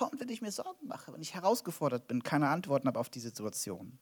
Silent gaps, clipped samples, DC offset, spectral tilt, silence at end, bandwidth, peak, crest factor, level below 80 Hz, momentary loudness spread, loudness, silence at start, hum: none; under 0.1%; under 0.1%; -5 dB/octave; 0.05 s; over 20 kHz; -16 dBFS; 20 dB; -80 dBFS; 12 LU; -35 LUFS; 0 s; none